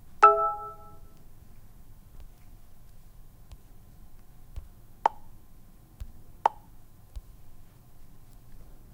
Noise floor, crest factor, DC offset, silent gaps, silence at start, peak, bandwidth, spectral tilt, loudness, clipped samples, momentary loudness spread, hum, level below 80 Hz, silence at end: -50 dBFS; 30 dB; under 0.1%; none; 0.05 s; -4 dBFS; 16 kHz; -5 dB/octave; -25 LUFS; under 0.1%; 30 LU; none; -50 dBFS; 0 s